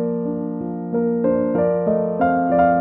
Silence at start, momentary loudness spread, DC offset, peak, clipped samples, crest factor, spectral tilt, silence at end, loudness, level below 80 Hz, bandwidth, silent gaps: 0 s; 8 LU; under 0.1%; -6 dBFS; under 0.1%; 14 dB; -12.5 dB/octave; 0 s; -20 LUFS; -50 dBFS; 3.8 kHz; none